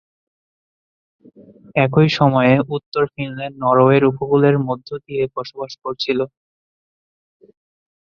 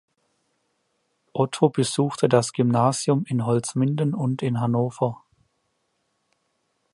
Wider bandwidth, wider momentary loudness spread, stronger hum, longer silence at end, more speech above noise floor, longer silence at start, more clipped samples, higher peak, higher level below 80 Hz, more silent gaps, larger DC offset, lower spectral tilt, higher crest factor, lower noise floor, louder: second, 7 kHz vs 11.5 kHz; first, 13 LU vs 6 LU; neither; about the same, 1.75 s vs 1.8 s; first, over 73 dB vs 51 dB; first, 1.75 s vs 1.35 s; neither; about the same, -2 dBFS vs -4 dBFS; first, -58 dBFS vs -64 dBFS; first, 2.86-2.92 s vs none; neither; first, -8 dB/octave vs -6 dB/octave; about the same, 18 dB vs 20 dB; first, under -90 dBFS vs -73 dBFS; first, -17 LUFS vs -23 LUFS